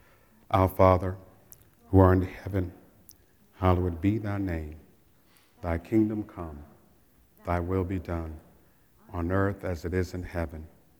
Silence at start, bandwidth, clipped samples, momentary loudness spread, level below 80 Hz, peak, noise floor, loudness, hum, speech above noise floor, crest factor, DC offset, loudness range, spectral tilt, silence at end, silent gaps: 0.5 s; 19.5 kHz; under 0.1%; 19 LU; -50 dBFS; -4 dBFS; -62 dBFS; -28 LUFS; none; 36 dB; 24 dB; under 0.1%; 7 LU; -9 dB/octave; 0.35 s; none